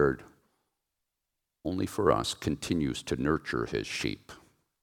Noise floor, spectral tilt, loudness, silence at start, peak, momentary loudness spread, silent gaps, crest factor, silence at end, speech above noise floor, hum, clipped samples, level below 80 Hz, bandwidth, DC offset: -85 dBFS; -5 dB/octave; -31 LUFS; 0 s; -8 dBFS; 9 LU; none; 24 dB; 0.45 s; 55 dB; none; under 0.1%; -52 dBFS; 18.5 kHz; under 0.1%